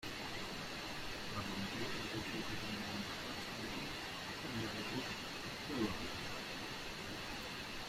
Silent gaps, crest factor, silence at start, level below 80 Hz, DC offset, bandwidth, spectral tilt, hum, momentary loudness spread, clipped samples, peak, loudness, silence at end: none; 18 dB; 0 s; -60 dBFS; under 0.1%; 16 kHz; -3.5 dB/octave; none; 3 LU; under 0.1%; -26 dBFS; -43 LUFS; 0 s